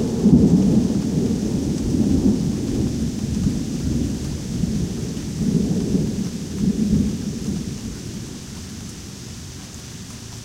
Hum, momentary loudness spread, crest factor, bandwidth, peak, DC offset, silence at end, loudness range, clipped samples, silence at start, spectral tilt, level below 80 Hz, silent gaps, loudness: none; 18 LU; 20 dB; 16 kHz; -2 dBFS; under 0.1%; 0 s; 7 LU; under 0.1%; 0 s; -7 dB/octave; -34 dBFS; none; -21 LUFS